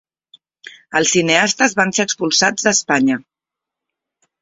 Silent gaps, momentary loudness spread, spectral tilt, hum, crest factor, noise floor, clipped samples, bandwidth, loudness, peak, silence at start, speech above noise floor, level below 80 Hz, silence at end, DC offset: none; 5 LU; -2.5 dB/octave; none; 18 dB; -85 dBFS; under 0.1%; 8 kHz; -15 LUFS; 0 dBFS; 0.65 s; 69 dB; -60 dBFS; 1.2 s; under 0.1%